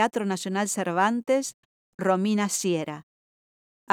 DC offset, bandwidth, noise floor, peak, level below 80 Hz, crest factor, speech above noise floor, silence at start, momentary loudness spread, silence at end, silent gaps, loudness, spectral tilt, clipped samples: under 0.1%; 18 kHz; under -90 dBFS; -8 dBFS; -80 dBFS; 20 dB; over 65 dB; 0 s; 8 LU; 0 s; 1.54-1.98 s, 3.03-3.87 s; -26 LUFS; -4.5 dB/octave; under 0.1%